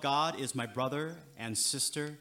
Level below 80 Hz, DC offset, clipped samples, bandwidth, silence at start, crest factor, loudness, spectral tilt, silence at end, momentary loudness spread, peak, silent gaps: -78 dBFS; under 0.1%; under 0.1%; 17.5 kHz; 0 s; 16 dB; -33 LUFS; -2.5 dB/octave; 0 s; 9 LU; -18 dBFS; none